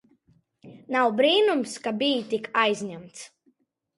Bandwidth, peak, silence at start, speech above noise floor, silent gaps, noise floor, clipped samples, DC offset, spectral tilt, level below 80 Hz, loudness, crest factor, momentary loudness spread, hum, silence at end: 11.5 kHz; -6 dBFS; 0.65 s; 43 dB; none; -68 dBFS; under 0.1%; under 0.1%; -3.5 dB/octave; -76 dBFS; -24 LUFS; 20 dB; 21 LU; none; 0.7 s